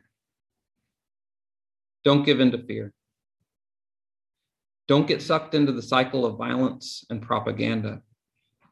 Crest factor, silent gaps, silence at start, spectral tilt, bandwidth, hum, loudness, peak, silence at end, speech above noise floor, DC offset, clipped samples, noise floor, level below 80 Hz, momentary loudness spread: 22 dB; none; 2.05 s; -6.5 dB/octave; 11.5 kHz; none; -24 LUFS; -4 dBFS; 0.7 s; 52 dB; under 0.1%; under 0.1%; -75 dBFS; -64 dBFS; 14 LU